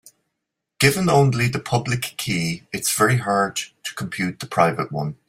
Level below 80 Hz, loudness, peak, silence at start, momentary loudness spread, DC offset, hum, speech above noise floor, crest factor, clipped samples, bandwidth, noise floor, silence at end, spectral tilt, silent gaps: -54 dBFS; -21 LUFS; -2 dBFS; 0.8 s; 10 LU; under 0.1%; none; 60 dB; 20 dB; under 0.1%; 16 kHz; -80 dBFS; 0.15 s; -4.5 dB/octave; none